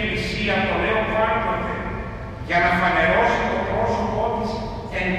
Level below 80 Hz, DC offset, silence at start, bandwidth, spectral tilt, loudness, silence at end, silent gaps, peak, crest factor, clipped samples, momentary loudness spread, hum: -36 dBFS; under 0.1%; 0 s; 13 kHz; -6 dB/octave; -21 LUFS; 0 s; none; -6 dBFS; 16 dB; under 0.1%; 11 LU; none